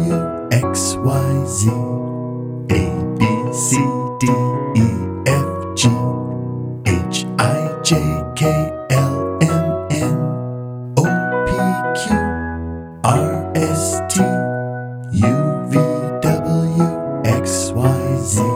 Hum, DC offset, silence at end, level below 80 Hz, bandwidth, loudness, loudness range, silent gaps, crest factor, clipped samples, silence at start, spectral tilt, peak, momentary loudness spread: none; under 0.1%; 0 s; -38 dBFS; 16.5 kHz; -18 LUFS; 1 LU; none; 16 dB; under 0.1%; 0 s; -5.5 dB/octave; 0 dBFS; 7 LU